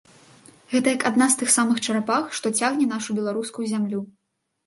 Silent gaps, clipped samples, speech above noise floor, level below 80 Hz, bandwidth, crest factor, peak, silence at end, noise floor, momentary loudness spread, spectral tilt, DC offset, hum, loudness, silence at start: none; under 0.1%; 54 dB; -72 dBFS; 12 kHz; 18 dB; -6 dBFS; 0.6 s; -77 dBFS; 9 LU; -3 dB/octave; under 0.1%; none; -22 LUFS; 0.7 s